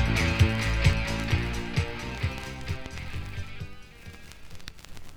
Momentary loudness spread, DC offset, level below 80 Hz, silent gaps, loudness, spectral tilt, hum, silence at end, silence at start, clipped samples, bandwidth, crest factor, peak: 22 LU; under 0.1%; -34 dBFS; none; -29 LUFS; -5.5 dB/octave; none; 0 s; 0 s; under 0.1%; 16 kHz; 20 dB; -8 dBFS